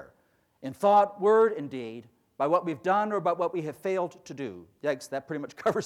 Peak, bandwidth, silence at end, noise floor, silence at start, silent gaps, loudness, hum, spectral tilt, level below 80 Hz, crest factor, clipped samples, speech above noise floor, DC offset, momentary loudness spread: -12 dBFS; 13.5 kHz; 0 s; -68 dBFS; 0 s; none; -27 LUFS; none; -6 dB/octave; -74 dBFS; 16 dB; under 0.1%; 41 dB; under 0.1%; 16 LU